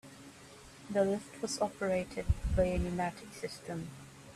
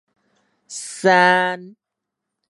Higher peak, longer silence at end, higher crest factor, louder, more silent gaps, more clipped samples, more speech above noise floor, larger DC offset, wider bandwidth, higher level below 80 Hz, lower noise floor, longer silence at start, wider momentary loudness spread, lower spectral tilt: second, -16 dBFS vs -2 dBFS; second, 0 s vs 0.8 s; about the same, 20 dB vs 20 dB; second, -35 LUFS vs -16 LUFS; neither; neither; second, 20 dB vs 65 dB; neither; first, 14 kHz vs 11.5 kHz; first, -44 dBFS vs -78 dBFS; second, -54 dBFS vs -82 dBFS; second, 0.05 s vs 0.7 s; about the same, 21 LU vs 19 LU; first, -5.5 dB/octave vs -3.5 dB/octave